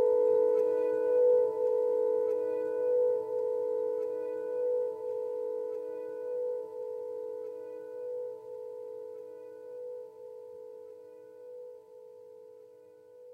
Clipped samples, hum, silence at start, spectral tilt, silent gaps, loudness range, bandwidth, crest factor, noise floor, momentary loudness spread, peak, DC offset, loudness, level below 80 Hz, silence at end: under 0.1%; none; 0 s; -6.5 dB/octave; none; 18 LU; 2.6 kHz; 14 dB; -55 dBFS; 22 LU; -18 dBFS; under 0.1%; -31 LUFS; -84 dBFS; 0 s